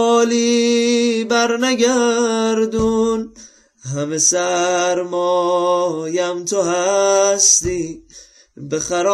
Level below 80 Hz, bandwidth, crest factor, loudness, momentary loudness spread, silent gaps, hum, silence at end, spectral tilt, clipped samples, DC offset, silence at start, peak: -46 dBFS; 14.5 kHz; 14 dB; -16 LUFS; 11 LU; none; none; 0 s; -2.5 dB/octave; under 0.1%; under 0.1%; 0 s; -4 dBFS